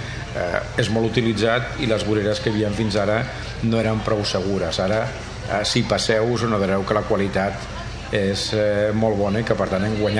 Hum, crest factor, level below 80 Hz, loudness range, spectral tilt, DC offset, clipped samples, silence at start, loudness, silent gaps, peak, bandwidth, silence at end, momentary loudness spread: none; 18 dB; -38 dBFS; 1 LU; -5.5 dB/octave; under 0.1%; under 0.1%; 0 s; -21 LUFS; none; -2 dBFS; 11 kHz; 0 s; 6 LU